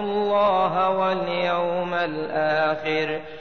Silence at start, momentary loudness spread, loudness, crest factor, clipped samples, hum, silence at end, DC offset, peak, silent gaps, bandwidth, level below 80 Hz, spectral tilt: 0 s; 5 LU; -23 LUFS; 12 dB; under 0.1%; none; 0 s; 0.5%; -10 dBFS; none; 6.6 kHz; -60 dBFS; -6.5 dB/octave